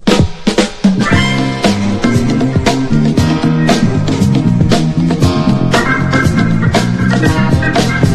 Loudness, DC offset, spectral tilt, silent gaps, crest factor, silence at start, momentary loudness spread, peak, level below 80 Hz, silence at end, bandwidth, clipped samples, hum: -12 LUFS; under 0.1%; -6 dB/octave; none; 10 dB; 0 s; 2 LU; 0 dBFS; -28 dBFS; 0 s; 13.5 kHz; 0.2%; none